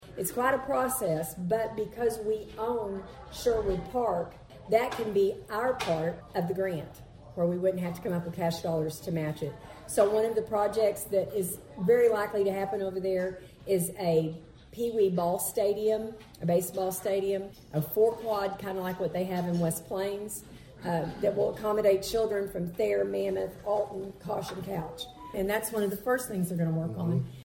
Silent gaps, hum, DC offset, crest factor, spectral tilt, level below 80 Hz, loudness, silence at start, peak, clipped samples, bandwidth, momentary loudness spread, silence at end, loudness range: none; none; under 0.1%; 18 dB; -5.5 dB/octave; -56 dBFS; -30 LUFS; 0 s; -12 dBFS; under 0.1%; 17 kHz; 10 LU; 0 s; 4 LU